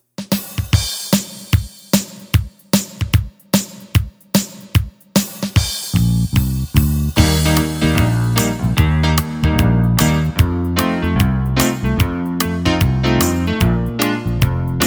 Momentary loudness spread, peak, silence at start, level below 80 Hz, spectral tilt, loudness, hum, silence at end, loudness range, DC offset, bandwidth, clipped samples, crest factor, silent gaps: 5 LU; 0 dBFS; 0.2 s; -26 dBFS; -5 dB/octave; -17 LUFS; none; 0 s; 4 LU; under 0.1%; over 20 kHz; under 0.1%; 16 dB; none